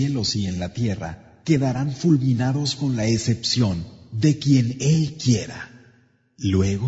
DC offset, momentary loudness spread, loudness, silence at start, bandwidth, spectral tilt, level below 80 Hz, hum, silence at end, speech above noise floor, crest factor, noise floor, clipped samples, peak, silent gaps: under 0.1%; 12 LU; -22 LUFS; 0 s; 8 kHz; -6 dB/octave; -50 dBFS; none; 0 s; 37 dB; 16 dB; -58 dBFS; under 0.1%; -6 dBFS; none